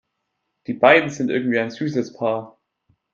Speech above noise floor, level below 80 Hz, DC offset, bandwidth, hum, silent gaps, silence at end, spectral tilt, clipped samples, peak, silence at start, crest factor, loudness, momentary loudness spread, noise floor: 57 dB; -68 dBFS; under 0.1%; 7.6 kHz; none; none; 0.65 s; -5.5 dB/octave; under 0.1%; 0 dBFS; 0.7 s; 20 dB; -19 LUFS; 14 LU; -76 dBFS